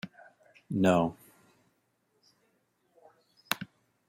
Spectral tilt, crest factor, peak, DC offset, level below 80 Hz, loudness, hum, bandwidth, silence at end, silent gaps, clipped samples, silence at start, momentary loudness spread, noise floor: -6 dB/octave; 26 dB; -8 dBFS; under 0.1%; -70 dBFS; -30 LUFS; none; 16 kHz; 0.45 s; none; under 0.1%; 0.05 s; 19 LU; -75 dBFS